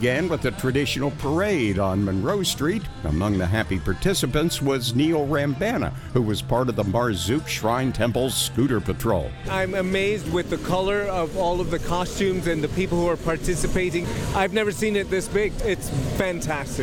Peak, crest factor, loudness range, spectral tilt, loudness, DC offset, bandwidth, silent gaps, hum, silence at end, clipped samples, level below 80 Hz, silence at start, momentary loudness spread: -4 dBFS; 18 dB; 1 LU; -5 dB/octave; -24 LUFS; under 0.1%; 19 kHz; none; none; 0 s; under 0.1%; -36 dBFS; 0 s; 4 LU